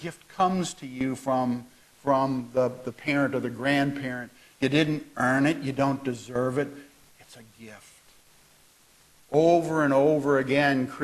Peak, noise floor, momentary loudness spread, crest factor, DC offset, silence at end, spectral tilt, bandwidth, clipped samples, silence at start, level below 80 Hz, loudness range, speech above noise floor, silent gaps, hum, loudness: -8 dBFS; -59 dBFS; 12 LU; 18 dB; under 0.1%; 0 s; -6 dB/octave; 13 kHz; under 0.1%; 0 s; -62 dBFS; 7 LU; 33 dB; none; none; -26 LUFS